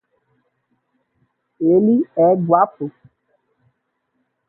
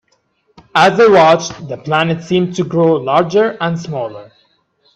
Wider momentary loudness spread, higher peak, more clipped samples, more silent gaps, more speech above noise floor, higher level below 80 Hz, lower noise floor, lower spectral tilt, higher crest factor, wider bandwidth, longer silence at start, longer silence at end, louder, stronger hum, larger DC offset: second, 12 LU vs 15 LU; about the same, 0 dBFS vs 0 dBFS; neither; neither; first, 56 dB vs 47 dB; second, -66 dBFS vs -54 dBFS; first, -71 dBFS vs -60 dBFS; first, -13.5 dB/octave vs -5.5 dB/octave; first, 20 dB vs 14 dB; second, 2.4 kHz vs 10 kHz; first, 1.6 s vs 0.75 s; first, 1.6 s vs 0.7 s; second, -16 LUFS vs -13 LUFS; neither; neither